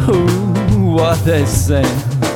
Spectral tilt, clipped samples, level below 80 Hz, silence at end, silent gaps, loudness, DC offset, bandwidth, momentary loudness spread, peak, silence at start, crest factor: -6 dB/octave; under 0.1%; -28 dBFS; 0 s; none; -14 LUFS; under 0.1%; 17.5 kHz; 2 LU; 0 dBFS; 0 s; 12 dB